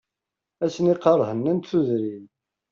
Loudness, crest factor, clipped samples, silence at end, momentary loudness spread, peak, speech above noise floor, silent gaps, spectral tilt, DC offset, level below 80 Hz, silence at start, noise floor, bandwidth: -23 LUFS; 18 dB; under 0.1%; 0.45 s; 10 LU; -6 dBFS; 64 dB; none; -7.5 dB/octave; under 0.1%; -68 dBFS; 0.6 s; -86 dBFS; 7.4 kHz